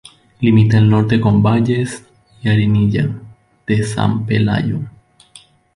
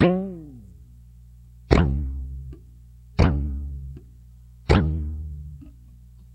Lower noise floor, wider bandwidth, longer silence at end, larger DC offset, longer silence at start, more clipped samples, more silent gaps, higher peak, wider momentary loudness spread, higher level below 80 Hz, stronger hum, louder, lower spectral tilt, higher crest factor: about the same, -46 dBFS vs -47 dBFS; first, 11 kHz vs 9 kHz; first, 0.85 s vs 0.1 s; neither; first, 0.4 s vs 0 s; neither; neither; about the same, -2 dBFS vs 0 dBFS; second, 13 LU vs 24 LU; second, -42 dBFS vs -30 dBFS; second, none vs 60 Hz at -45 dBFS; first, -15 LUFS vs -24 LUFS; about the same, -7.5 dB/octave vs -8 dB/octave; second, 14 dB vs 26 dB